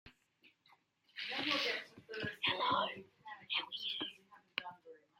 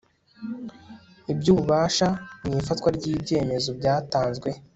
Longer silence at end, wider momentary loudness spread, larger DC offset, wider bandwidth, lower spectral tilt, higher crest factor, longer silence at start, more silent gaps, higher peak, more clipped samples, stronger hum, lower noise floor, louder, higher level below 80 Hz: about the same, 0.25 s vs 0.15 s; about the same, 18 LU vs 16 LU; neither; first, 16 kHz vs 8.2 kHz; second, -3 dB/octave vs -5.5 dB/octave; first, 24 dB vs 18 dB; second, 0.05 s vs 0.4 s; neither; second, -18 dBFS vs -6 dBFS; neither; neither; first, -72 dBFS vs -48 dBFS; second, -38 LUFS vs -24 LUFS; second, -82 dBFS vs -50 dBFS